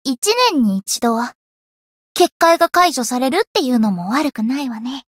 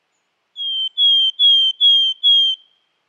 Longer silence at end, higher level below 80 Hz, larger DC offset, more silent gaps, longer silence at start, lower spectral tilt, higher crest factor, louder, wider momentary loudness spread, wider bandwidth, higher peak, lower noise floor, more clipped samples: second, 0.15 s vs 0.55 s; first, -60 dBFS vs under -90 dBFS; neither; first, 0.18-0.22 s, 1.35-2.15 s, 2.32-2.40 s, 3.47-3.55 s vs none; second, 0.05 s vs 0.55 s; first, -3.5 dB/octave vs 5.5 dB/octave; first, 16 dB vs 10 dB; second, -16 LUFS vs -12 LUFS; about the same, 9 LU vs 11 LU; first, 16.5 kHz vs 10.5 kHz; first, -2 dBFS vs -6 dBFS; first, under -90 dBFS vs -69 dBFS; neither